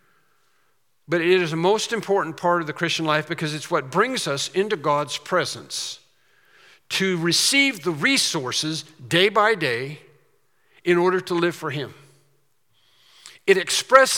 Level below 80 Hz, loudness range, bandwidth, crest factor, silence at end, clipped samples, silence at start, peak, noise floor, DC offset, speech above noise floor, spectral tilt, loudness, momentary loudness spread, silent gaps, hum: -70 dBFS; 5 LU; 17 kHz; 22 dB; 0 s; under 0.1%; 1.1 s; 0 dBFS; -69 dBFS; under 0.1%; 47 dB; -3 dB/octave; -21 LUFS; 12 LU; none; none